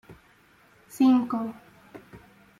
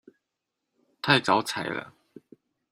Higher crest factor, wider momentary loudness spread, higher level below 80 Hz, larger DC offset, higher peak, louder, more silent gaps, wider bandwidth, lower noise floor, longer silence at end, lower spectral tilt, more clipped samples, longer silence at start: second, 18 dB vs 26 dB; first, 27 LU vs 13 LU; about the same, -66 dBFS vs -68 dBFS; neither; second, -12 dBFS vs -4 dBFS; about the same, -24 LUFS vs -25 LUFS; neither; second, 13 kHz vs 15 kHz; second, -59 dBFS vs -84 dBFS; second, 0.4 s vs 0.85 s; first, -6 dB/octave vs -4 dB/octave; neither; second, 0.1 s vs 1.05 s